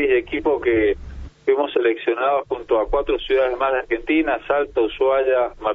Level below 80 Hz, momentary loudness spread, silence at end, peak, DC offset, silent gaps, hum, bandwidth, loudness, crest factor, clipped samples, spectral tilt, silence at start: -40 dBFS; 4 LU; 0 s; -6 dBFS; under 0.1%; none; none; 4.1 kHz; -20 LUFS; 14 dB; under 0.1%; -7 dB/octave; 0 s